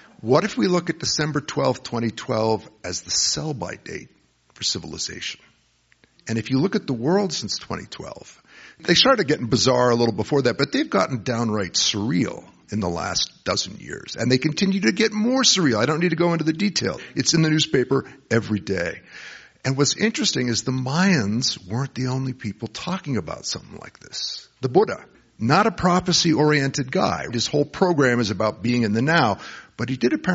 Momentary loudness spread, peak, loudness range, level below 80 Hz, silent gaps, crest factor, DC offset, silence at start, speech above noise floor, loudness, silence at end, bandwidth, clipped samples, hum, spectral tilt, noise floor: 13 LU; -2 dBFS; 6 LU; -54 dBFS; none; 20 dB; under 0.1%; 0.2 s; 40 dB; -21 LUFS; 0 s; 8 kHz; under 0.1%; none; -4 dB/octave; -62 dBFS